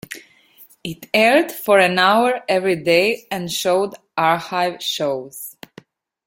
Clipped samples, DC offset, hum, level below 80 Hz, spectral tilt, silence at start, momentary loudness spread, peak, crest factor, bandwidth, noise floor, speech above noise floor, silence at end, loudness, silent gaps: under 0.1%; under 0.1%; none; -62 dBFS; -3.5 dB/octave; 0.1 s; 18 LU; -2 dBFS; 18 dB; 17 kHz; -50 dBFS; 32 dB; 0.75 s; -18 LUFS; none